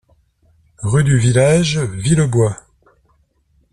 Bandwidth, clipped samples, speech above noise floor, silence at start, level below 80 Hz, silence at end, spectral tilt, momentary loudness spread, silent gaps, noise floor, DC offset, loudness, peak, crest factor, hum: 12 kHz; under 0.1%; 45 dB; 0.8 s; -42 dBFS; 1.15 s; -6 dB/octave; 7 LU; none; -59 dBFS; under 0.1%; -15 LUFS; -2 dBFS; 14 dB; none